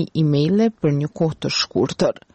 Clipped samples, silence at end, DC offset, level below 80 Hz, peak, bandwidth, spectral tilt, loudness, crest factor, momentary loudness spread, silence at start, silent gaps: under 0.1%; 0.2 s; under 0.1%; -52 dBFS; -8 dBFS; 8.4 kHz; -6 dB/octave; -20 LUFS; 12 dB; 5 LU; 0 s; none